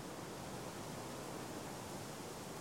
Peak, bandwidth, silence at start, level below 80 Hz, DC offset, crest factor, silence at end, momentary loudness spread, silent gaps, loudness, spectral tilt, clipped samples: -34 dBFS; 16.5 kHz; 0 s; -68 dBFS; under 0.1%; 14 dB; 0 s; 1 LU; none; -47 LUFS; -4 dB/octave; under 0.1%